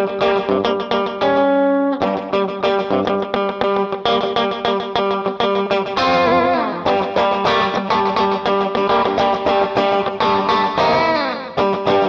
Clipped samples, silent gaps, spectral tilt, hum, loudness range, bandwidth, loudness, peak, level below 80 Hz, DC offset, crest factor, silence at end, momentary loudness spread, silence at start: under 0.1%; none; -6 dB/octave; none; 2 LU; 7.2 kHz; -17 LUFS; -2 dBFS; -50 dBFS; under 0.1%; 16 dB; 0 s; 4 LU; 0 s